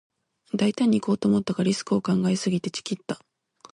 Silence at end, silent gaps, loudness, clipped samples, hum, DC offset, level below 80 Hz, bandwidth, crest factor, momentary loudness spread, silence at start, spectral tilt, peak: 0.55 s; none; -25 LUFS; under 0.1%; none; under 0.1%; -64 dBFS; 11 kHz; 14 dB; 10 LU; 0.55 s; -6 dB/octave; -10 dBFS